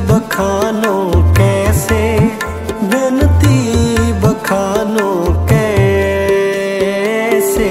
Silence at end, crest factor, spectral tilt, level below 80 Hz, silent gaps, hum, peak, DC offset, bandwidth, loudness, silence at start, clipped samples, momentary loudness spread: 0 s; 12 dB; -6 dB/octave; -24 dBFS; none; none; 0 dBFS; under 0.1%; 16 kHz; -13 LUFS; 0 s; under 0.1%; 4 LU